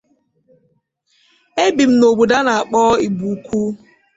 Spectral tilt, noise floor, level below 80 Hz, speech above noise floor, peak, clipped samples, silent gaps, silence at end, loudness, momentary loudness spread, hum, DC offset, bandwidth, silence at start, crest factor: -5 dB/octave; -63 dBFS; -52 dBFS; 49 dB; -2 dBFS; under 0.1%; none; 0.4 s; -15 LUFS; 11 LU; none; under 0.1%; 8 kHz; 1.55 s; 14 dB